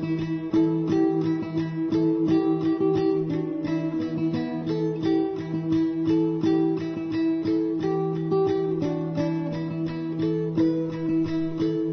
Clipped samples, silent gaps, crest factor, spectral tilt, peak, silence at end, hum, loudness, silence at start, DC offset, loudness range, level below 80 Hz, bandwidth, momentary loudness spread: under 0.1%; none; 12 dB; -9 dB/octave; -12 dBFS; 0 s; none; -25 LUFS; 0 s; under 0.1%; 2 LU; -58 dBFS; 6.4 kHz; 5 LU